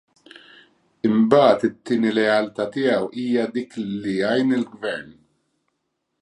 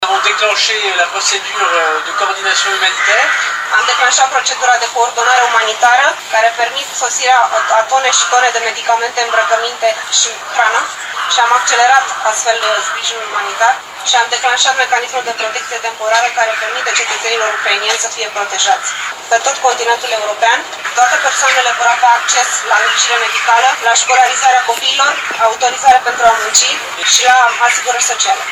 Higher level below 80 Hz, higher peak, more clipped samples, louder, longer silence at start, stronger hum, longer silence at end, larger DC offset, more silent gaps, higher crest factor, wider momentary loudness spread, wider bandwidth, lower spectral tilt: second, -66 dBFS vs -60 dBFS; about the same, -2 dBFS vs 0 dBFS; second, under 0.1% vs 0.1%; second, -21 LUFS vs -11 LUFS; first, 1.05 s vs 0 s; neither; first, 1.1 s vs 0 s; neither; neither; first, 20 dB vs 12 dB; first, 13 LU vs 6 LU; second, 10.5 kHz vs over 20 kHz; first, -6.5 dB/octave vs 2.5 dB/octave